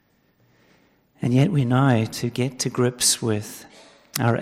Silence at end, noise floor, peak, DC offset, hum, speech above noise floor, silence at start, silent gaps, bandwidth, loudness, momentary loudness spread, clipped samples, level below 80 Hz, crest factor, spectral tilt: 0 s; -62 dBFS; -6 dBFS; under 0.1%; none; 41 dB; 1.2 s; none; 16 kHz; -22 LUFS; 11 LU; under 0.1%; -60 dBFS; 18 dB; -5 dB/octave